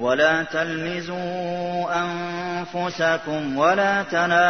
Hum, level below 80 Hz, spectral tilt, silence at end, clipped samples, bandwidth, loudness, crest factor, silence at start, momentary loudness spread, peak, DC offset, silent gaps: none; -60 dBFS; -5 dB/octave; 0 s; under 0.1%; 6.6 kHz; -23 LUFS; 16 dB; 0 s; 9 LU; -6 dBFS; 0.3%; none